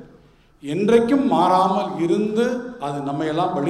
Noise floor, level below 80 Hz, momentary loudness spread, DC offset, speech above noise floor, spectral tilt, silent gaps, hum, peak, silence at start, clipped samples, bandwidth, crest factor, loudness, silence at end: -52 dBFS; -56 dBFS; 11 LU; under 0.1%; 32 dB; -6.5 dB/octave; none; none; -4 dBFS; 0 s; under 0.1%; 12.5 kHz; 16 dB; -20 LUFS; 0 s